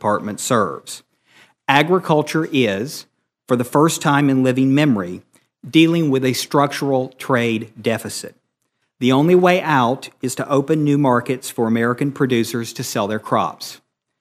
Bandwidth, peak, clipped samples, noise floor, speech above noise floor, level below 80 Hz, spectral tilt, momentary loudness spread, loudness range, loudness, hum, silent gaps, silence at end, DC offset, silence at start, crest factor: 15.5 kHz; 0 dBFS; under 0.1%; -72 dBFS; 54 dB; -64 dBFS; -5.5 dB/octave; 12 LU; 3 LU; -18 LUFS; none; none; 0.45 s; under 0.1%; 0 s; 18 dB